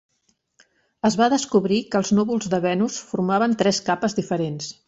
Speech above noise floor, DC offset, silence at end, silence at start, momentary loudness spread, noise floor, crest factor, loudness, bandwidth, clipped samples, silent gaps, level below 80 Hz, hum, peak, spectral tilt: 48 dB; under 0.1%; 0.15 s; 1.05 s; 6 LU; -69 dBFS; 16 dB; -21 LUFS; 8 kHz; under 0.1%; none; -60 dBFS; none; -6 dBFS; -5 dB/octave